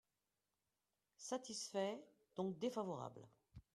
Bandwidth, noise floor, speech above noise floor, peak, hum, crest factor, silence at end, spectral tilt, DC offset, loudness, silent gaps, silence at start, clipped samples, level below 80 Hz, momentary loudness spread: 13.5 kHz; under -90 dBFS; over 44 dB; -30 dBFS; none; 20 dB; 0.15 s; -4.5 dB/octave; under 0.1%; -47 LUFS; none; 1.2 s; under 0.1%; -78 dBFS; 17 LU